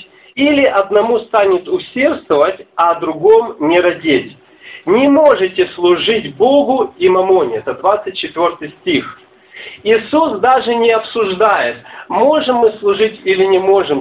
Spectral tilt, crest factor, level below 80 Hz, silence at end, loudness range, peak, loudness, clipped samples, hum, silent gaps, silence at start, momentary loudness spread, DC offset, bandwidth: -8.5 dB/octave; 12 dB; -52 dBFS; 0 s; 3 LU; 0 dBFS; -13 LUFS; under 0.1%; none; none; 0.35 s; 8 LU; under 0.1%; 4 kHz